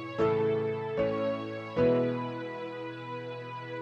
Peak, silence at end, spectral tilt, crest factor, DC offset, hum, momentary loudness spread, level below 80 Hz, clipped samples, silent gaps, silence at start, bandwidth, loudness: -16 dBFS; 0 s; -8 dB/octave; 14 dB; under 0.1%; none; 12 LU; -60 dBFS; under 0.1%; none; 0 s; 7.4 kHz; -31 LUFS